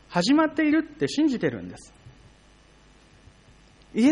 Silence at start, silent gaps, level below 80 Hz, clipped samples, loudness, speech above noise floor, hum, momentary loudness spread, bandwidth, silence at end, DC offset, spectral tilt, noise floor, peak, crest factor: 0.1 s; none; -58 dBFS; under 0.1%; -24 LUFS; 32 dB; none; 17 LU; 10.5 kHz; 0 s; under 0.1%; -5.5 dB/octave; -55 dBFS; -8 dBFS; 18 dB